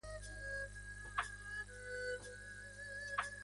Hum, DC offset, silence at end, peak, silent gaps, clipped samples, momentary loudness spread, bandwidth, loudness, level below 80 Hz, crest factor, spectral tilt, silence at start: 50 Hz at -55 dBFS; under 0.1%; 0 s; -24 dBFS; none; under 0.1%; 8 LU; 11.5 kHz; -46 LUFS; -58 dBFS; 22 dB; -2.5 dB/octave; 0.05 s